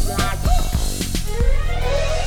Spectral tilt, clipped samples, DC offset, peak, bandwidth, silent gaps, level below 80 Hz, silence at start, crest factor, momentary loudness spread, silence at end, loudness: -4.5 dB/octave; under 0.1%; under 0.1%; -4 dBFS; 17.5 kHz; none; -18 dBFS; 0 s; 14 dB; 3 LU; 0 s; -22 LUFS